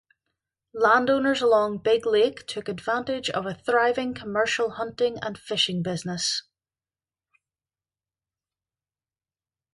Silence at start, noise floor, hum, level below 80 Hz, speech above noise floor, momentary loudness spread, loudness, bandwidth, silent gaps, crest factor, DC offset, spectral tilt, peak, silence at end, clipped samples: 0.75 s; under -90 dBFS; none; -64 dBFS; over 66 dB; 9 LU; -24 LUFS; 11.5 kHz; none; 20 dB; under 0.1%; -3.5 dB/octave; -6 dBFS; 3.35 s; under 0.1%